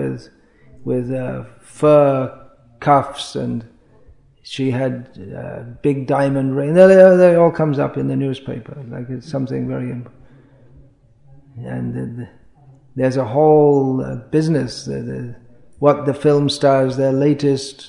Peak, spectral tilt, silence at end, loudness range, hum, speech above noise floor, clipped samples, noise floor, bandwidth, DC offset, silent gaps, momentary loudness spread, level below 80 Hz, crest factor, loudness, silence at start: 0 dBFS; -7 dB/octave; 0 s; 14 LU; none; 33 dB; under 0.1%; -49 dBFS; 11 kHz; under 0.1%; none; 19 LU; -52 dBFS; 18 dB; -16 LUFS; 0 s